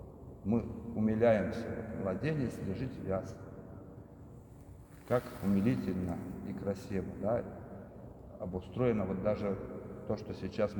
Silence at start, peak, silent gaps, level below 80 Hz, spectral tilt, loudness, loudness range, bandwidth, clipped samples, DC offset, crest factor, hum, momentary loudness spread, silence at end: 0 s; -16 dBFS; none; -58 dBFS; -8.5 dB/octave; -35 LUFS; 5 LU; over 20 kHz; under 0.1%; under 0.1%; 20 dB; none; 20 LU; 0 s